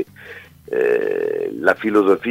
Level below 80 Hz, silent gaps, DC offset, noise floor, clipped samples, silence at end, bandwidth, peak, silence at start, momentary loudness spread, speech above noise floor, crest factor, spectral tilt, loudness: -60 dBFS; none; under 0.1%; -40 dBFS; under 0.1%; 0 s; 15.5 kHz; 0 dBFS; 0 s; 22 LU; 22 dB; 18 dB; -6.5 dB/octave; -19 LUFS